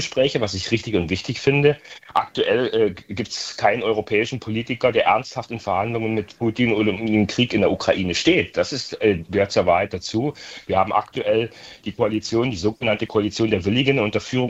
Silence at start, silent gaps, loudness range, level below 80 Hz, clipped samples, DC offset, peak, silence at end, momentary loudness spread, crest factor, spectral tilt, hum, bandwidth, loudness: 0 s; none; 2 LU; -52 dBFS; under 0.1%; under 0.1%; -2 dBFS; 0 s; 7 LU; 20 dB; -5.5 dB/octave; none; 8.2 kHz; -21 LUFS